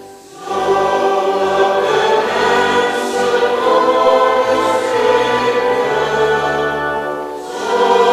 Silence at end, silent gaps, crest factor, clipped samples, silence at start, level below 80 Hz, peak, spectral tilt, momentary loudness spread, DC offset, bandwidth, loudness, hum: 0 s; none; 14 dB; under 0.1%; 0 s; -48 dBFS; -2 dBFS; -3.5 dB/octave; 8 LU; under 0.1%; 15 kHz; -14 LUFS; none